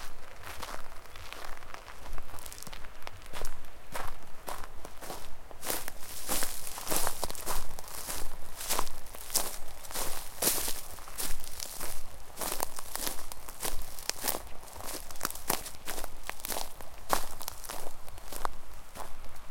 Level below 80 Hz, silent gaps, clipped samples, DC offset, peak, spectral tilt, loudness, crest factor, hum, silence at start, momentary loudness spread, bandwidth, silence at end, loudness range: -42 dBFS; none; under 0.1%; under 0.1%; -4 dBFS; -1.5 dB/octave; -37 LUFS; 26 dB; none; 0 s; 15 LU; 17 kHz; 0 s; 11 LU